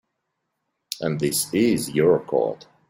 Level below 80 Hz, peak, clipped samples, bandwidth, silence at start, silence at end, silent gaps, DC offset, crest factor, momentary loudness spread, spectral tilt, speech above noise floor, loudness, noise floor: -60 dBFS; -6 dBFS; under 0.1%; 16.5 kHz; 0.9 s; 0.35 s; none; under 0.1%; 18 dB; 9 LU; -4.5 dB/octave; 56 dB; -22 LUFS; -78 dBFS